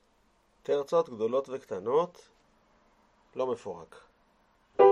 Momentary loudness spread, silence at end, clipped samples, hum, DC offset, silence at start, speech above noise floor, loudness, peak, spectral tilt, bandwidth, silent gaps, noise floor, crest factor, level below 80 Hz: 16 LU; 0 s; under 0.1%; none; under 0.1%; 0.7 s; 37 dB; -31 LUFS; -8 dBFS; -6 dB/octave; 9.2 kHz; none; -68 dBFS; 22 dB; -72 dBFS